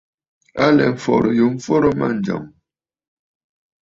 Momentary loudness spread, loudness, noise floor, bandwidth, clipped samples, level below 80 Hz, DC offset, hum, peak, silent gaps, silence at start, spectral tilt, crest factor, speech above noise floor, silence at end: 10 LU; -17 LUFS; -73 dBFS; 7.8 kHz; under 0.1%; -52 dBFS; under 0.1%; none; -2 dBFS; none; 0.55 s; -7 dB/octave; 18 dB; 57 dB; 1.5 s